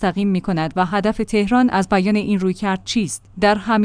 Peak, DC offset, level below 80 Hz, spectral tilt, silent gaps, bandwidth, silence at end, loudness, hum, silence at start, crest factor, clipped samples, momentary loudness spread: -4 dBFS; under 0.1%; -42 dBFS; -5.5 dB/octave; none; 10.5 kHz; 0 s; -19 LUFS; none; 0 s; 14 dB; under 0.1%; 5 LU